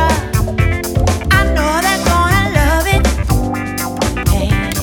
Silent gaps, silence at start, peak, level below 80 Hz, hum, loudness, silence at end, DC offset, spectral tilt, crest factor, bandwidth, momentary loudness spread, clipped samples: none; 0 s; 0 dBFS; -18 dBFS; none; -14 LUFS; 0 s; under 0.1%; -5 dB/octave; 14 dB; 19 kHz; 5 LU; under 0.1%